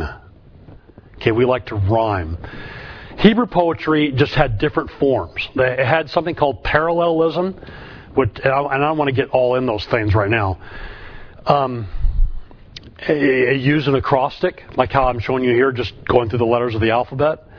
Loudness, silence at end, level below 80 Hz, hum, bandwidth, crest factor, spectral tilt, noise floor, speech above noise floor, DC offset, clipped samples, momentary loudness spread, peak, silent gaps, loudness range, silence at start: -18 LUFS; 0 s; -30 dBFS; none; 5.4 kHz; 18 dB; -8.5 dB/octave; -44 dBFS; 26 dB; under 0.1%; under 0.1%; 15 LU; 0 dBFS; none; 3 LU; 0 s